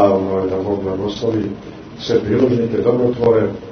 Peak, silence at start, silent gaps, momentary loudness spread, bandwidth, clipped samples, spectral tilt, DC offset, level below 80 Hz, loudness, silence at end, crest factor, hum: 0 dBFS; 0 s; none; 10 LU; 6.6 kHz; under 0.1%; -7.5 dB/octave; under 0.1%; -46 dBFS; -17 LUFS; 0 s; 16 dB; none